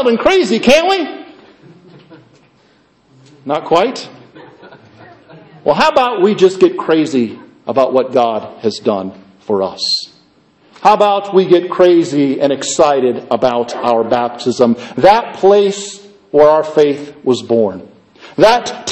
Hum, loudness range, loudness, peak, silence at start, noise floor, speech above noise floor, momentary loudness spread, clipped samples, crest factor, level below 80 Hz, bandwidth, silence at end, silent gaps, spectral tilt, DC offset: none; 9 LU; -13 LUFS; 0 dBFS; 0 s; -52 dBFS; 40 dB; 11 LU; under 0.1%; 14 dB; -50 dBFS; 11 kHz; 0 s; none; -4.5 dB/octave; under 0.1%